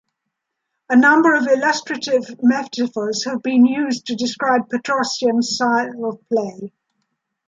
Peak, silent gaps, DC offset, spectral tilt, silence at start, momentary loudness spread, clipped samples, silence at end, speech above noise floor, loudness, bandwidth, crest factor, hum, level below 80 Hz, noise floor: -2 dBFS; none; under 0.1%; -3.5 dB/octave; 0.9 s; 9 LU; under 0.1%; 0.8 s; 60 dB; -18 LUFS; 7.8 kHz; 16 dB; none; -70 dBFS; -78 dBFS